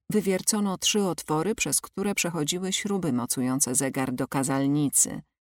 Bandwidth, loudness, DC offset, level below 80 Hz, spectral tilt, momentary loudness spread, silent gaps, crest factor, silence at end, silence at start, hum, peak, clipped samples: 18 kHz; -25 LUFS; under 0.1%; -60 dBFS; -3.5 dB/octave; 5 LU; none; 18 dB; 0.3 s; 0.1 s; none; -8 dBFS; under 0.1%